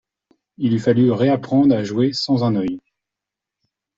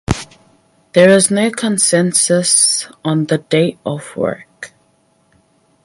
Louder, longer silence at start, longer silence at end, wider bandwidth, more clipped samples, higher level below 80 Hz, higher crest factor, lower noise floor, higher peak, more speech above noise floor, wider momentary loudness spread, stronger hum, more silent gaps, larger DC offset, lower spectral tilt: second, -18 LUFS vs -13 LUFS; first, 0.6 s vs 0.1 s; about the same, 1.2 s vs 1.2 s; second, 7.6 kHz vs 11.5 kHz; neither; second, -58 dBFS vs -42 dBFS; about the same, 16 dB vs 16 dB; first, -85 dBFS vs -57 dBFS; second, -4 dBFS vs 0 dBFS; first, 68 dB vs 43 dB; second, 8 LU vs 15 LU; neither; neither; neither; first, -7.5 dB/octave vs -3.5 dB/octave